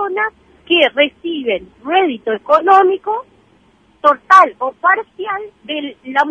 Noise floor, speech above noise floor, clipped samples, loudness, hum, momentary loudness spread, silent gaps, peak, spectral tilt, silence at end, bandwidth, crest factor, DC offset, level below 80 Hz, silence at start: -52 dBFS; 38 dB; under 0.1%; -14 LUFS; none; 14 LU; none; 0 dBFS; -3.5 dB/octave; 0 s; 9.8 kHz; 16 dB; under 0.1%; -58 dBFS; 0 s